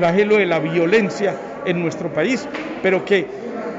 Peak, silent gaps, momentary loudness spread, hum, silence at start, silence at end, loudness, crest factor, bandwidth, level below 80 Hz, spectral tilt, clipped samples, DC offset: -4 dBFS; none; 10 LU; none; 0 s; 0 s; -19 LUFS; 14 dB; 8 kHz; -58 dBFS; -6 dB/octave; under 0.1%; under 0.1%